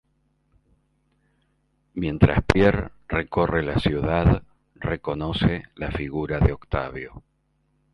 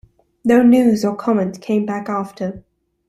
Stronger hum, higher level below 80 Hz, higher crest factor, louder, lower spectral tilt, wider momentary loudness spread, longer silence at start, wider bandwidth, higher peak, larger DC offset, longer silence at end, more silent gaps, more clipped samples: neither; first, -34 dBFS vs -56 dBFS; first, 24 dB vs 16 dB; second, -24 LUFS vs -17 LUFS; about the same, -8 dB/octave vs -7 dB/octave; about the same, 12 LU vs 14 LU; first, 1.95 s vs 0.45 s; second, 11 kHz vs 13.5 kHz; about the same, 0 dBFS vs -2 dBFS; neither; first, 0.75 s vs 0.5 s; neither; neither